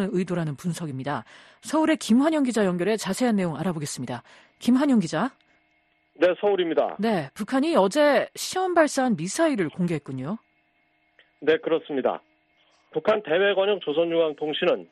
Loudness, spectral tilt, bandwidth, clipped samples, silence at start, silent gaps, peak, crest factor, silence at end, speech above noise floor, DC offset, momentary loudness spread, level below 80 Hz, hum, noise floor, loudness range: -24 LUFS; -5 dB/octave; 13 kHz; under 0.1%; 0 s; none; -6 dBFS; 18 dB; 0.05 s; 43 dB; under 0.1%; 10 LU; -66 dBFS; none; -67 dBFS; 4 LU